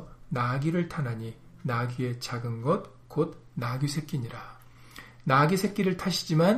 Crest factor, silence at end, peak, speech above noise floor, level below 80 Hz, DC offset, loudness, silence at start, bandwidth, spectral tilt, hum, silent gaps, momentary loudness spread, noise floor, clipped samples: 20 dB; 0 s; -8 dBFS; 21 dB; -56 dBFS; under 0.1%; -29 LUFS; 0 s; 15.5 kHz; -6 dB/octave; none; none; 16 LU; -49 dBFS; under 0.1%